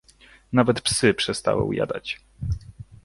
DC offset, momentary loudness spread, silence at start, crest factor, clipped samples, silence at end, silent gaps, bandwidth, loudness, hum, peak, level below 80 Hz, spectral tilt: under 0.1%; 12 LU; 0.5 s; 20 dB; under 0.1%; 0.2 s; none; 11.5 kHz; -24 LUFS; none; -4 dBFS; -42 dBFS; -4.5 dB/octave